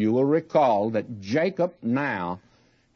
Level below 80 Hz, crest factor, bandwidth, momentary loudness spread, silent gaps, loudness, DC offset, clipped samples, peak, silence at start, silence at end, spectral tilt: -68 dBFS; 16 dB; 6.8 kHz; 9 LU; none; -24 LUFS; under 0.1%; under 0.1%; -10 dBFS; 0 s; 0.55 s; -7.5 dB/octave